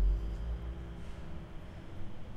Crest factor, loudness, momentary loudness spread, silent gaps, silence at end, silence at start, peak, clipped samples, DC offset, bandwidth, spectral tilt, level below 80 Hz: 14 dB; -43 LUFS; 11 LU; none; 0 s; 0 s; -22 dBFS; under 0.1%; under 0.1%; 5.6 kHz; -7.5 dB/octave; -38 dBFS